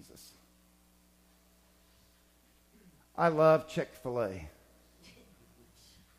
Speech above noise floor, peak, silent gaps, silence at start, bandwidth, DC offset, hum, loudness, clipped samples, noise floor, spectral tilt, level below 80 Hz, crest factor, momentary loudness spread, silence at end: 37 dB; -12 dBFS; none; 3.15 s; 15.5 kHz; under 0.1%; none; -30 LUFS; under 0.1%; -66 dBFS; -6.5 dB/octave; -64 dBFS; 24 dB; 27 LU; 1.7 s